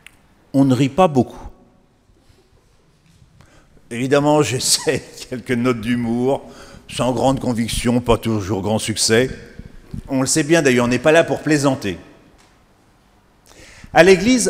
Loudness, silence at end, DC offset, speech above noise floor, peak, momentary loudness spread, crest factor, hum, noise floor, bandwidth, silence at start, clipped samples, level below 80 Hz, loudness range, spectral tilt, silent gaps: -17 LUFS; 0 s; under 0.1%; 38 dB; 0 dBFS; 12 LU; 18 dB; none; -55 dBFS; 16 kHz; 0.55 s; under 0.1%; -42 dBFS; 4 LU; -4.5 dB/octave; none